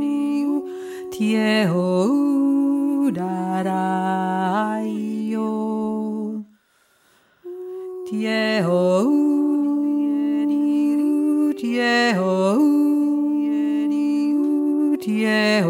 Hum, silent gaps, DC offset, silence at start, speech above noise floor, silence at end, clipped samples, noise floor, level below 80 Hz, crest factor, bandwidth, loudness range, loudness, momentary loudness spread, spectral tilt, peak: none; none; under 0.1%; 0 s; 41 dB; 0 s; under 0.1%; -61 dBFS; -74 dBFS; 12 dB; 13 kHz; 7 LU; -20 LUFS; 8 LU; -6.5 dB/octave; -8 dBFS